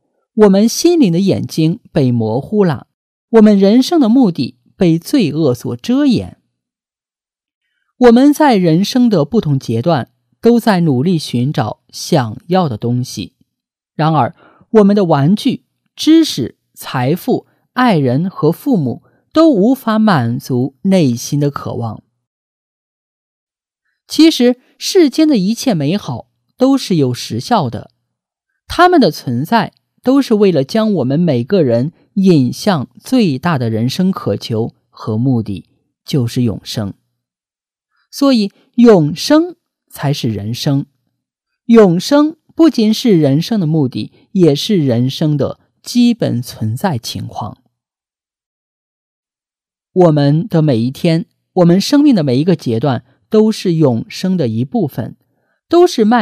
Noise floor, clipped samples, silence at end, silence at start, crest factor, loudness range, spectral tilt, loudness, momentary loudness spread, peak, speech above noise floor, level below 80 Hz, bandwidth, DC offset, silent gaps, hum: under -90 dBFS; 0.1%; 0 s; 0.35 s; 14 dB; 6 LU; -6.5 dB/octave; -13 LUFS; 12 LU; 0 dBFS; over 78 dB; -52 dBFS; 15.5 kHz; under 0.1%; 2.94-3.28 s, 7.55-7.61 s, 22.27-23.47 s, 48.46-49.23 s; none